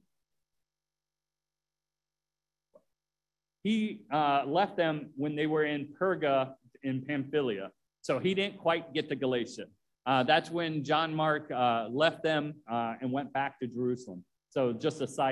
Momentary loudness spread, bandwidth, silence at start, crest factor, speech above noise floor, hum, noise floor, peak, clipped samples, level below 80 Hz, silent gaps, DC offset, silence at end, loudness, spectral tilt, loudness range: 10 LU; 12 kHz; 3.65 s; 20 dB; over 59 dB; 50 Hz at -65 dBFS; under -90 dBFS; -12 dBFS; under 0.1%; -76 dBFS; none; under 0.1%; 0 s; -31 LUFS; -6 dB/octave; 4 LU